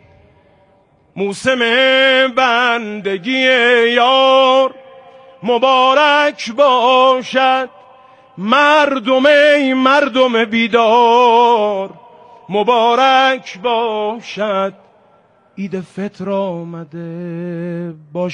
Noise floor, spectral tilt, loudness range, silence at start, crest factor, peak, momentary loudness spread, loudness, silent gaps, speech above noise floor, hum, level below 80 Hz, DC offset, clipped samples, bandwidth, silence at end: -53 dBFS; -4.5 dB/octave; 10 LU; 1.15 s; 14 dB; 0 dBFS; 15 LU; -12 LUFS; none; 40 dB; none; -62 dBFS; under 0.1%; under 0.1%; 10.5 kHz; 0 s